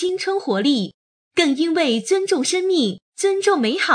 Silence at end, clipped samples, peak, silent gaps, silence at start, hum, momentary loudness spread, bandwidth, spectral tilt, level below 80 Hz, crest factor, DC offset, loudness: 0 s; under 0.1%; -2 dBFS; 0.94-1.31 s, 3.02-3.12 s; 0 s; none; 5 LU; 10 kHz; -3.5 dB/octave; -72 dBFS; 16 dB; under 0.1%; -19 LUFS